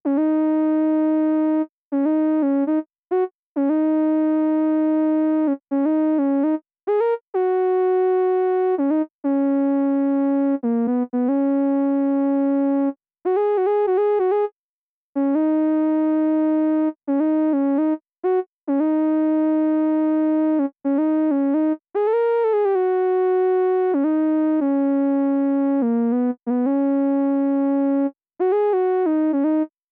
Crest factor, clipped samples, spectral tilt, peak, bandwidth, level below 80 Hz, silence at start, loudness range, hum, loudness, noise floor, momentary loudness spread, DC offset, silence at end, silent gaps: 6 dB; under 0.1%; -10 dB/octave; -14 dBFS; 3.5 kHz; -80 dBFS; 0.05 s; 1 LU; none; -20 LUFS; under -90 dBFS; 4 LU; under 0.1%; 0.25 s; 1.71-1.91 s, 2.98-3.03 s, 3.35-3.55 s, 7.23-7.33 s, 9.10-9.19 s, 14.52-15.13 s, 18.48-18.62 s